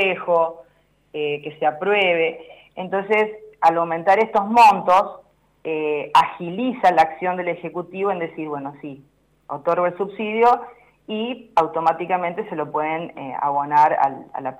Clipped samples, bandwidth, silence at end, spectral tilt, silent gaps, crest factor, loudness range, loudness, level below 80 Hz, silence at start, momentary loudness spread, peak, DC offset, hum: under 0.1%; 15.5 kHz; 0.05 s; -5.5 dB/octave; none; 14 dB; 6 LU; -20 LUFS; -64 dBFS; 0 s; 13 LU; -6 dBFS; under 0.1%; none